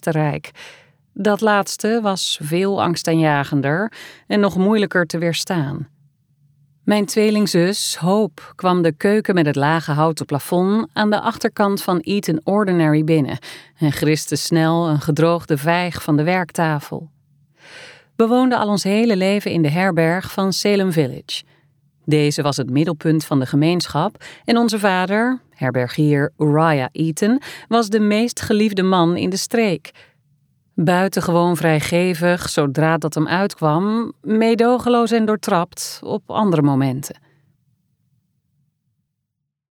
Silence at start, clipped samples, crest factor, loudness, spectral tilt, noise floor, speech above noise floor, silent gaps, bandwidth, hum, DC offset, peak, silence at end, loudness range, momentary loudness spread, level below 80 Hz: 0.05 s; under 0.1%; 16 dB; -18 LUFS; -5.5 dB/octave; -78 dBFS; 60 dB; none; 20 kHz; none; under 0.1%; -2 dBFS; 2.65 s; 2 LU; 7 LU; -56 dBFS